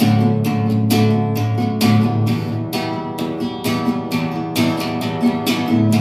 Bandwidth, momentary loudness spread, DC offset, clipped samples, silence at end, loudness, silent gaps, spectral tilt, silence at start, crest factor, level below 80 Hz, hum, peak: 16 kHz; 7 LU; under 0.1%; under 0.1%; 0 s; -18 LUFS; none; -6.5 dB/octave; 0 s; 14 dB; -54 dBFS; none; -2 dBFS